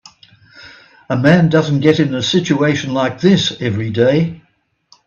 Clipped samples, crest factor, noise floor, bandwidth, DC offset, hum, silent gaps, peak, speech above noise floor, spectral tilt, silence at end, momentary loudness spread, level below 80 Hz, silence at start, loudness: under 0.1%; 16 dB; -61 dBFS; 7.2 kHz; under 0.1%; none; none; 0 dBFS; 47 dB; -6 dB/octave; 0.7 s; 7 LU; -52 dBFS; 0.55 s; -14 LUFS